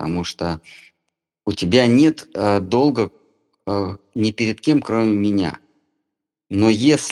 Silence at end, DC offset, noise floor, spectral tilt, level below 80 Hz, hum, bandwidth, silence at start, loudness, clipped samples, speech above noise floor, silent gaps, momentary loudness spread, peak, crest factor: 0 s; under 0.1%; -79 dBFS; -5.5 dB/octave; -52 dBFS; none; 12 kHz; 0 s; -19 LUFS; under 0.1%; 61 dB; none; 12 LU; 0 dBFS; 20 dB